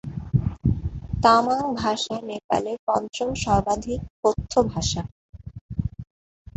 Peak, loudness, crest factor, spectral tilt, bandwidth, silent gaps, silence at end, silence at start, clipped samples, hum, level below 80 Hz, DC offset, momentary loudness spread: -2 dBFS; -24 LUFS; 22 dB; -5.5 dB/octave; 8.2 kHz; 2.44-2.49 s, 2.79-2.87 s, 4.10-4.23 s, 5.12-5.33 s, 5.61-5.69 s; 0.55 s; 0.05 s; under 0.1%; none; -38 dBFS; under 0.1%; 14 LU